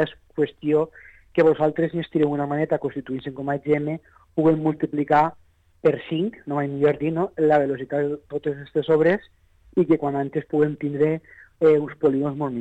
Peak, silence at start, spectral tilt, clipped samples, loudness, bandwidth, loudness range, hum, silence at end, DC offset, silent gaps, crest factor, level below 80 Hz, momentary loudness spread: -8 dBFS; 0 s; -9 dB/octave; under 0.1%; -23 LUFS; 7.6 kHz; 1 LU; none; 0 s; under 0.1%; none; 14 dB; -58 dBFS; 9 LU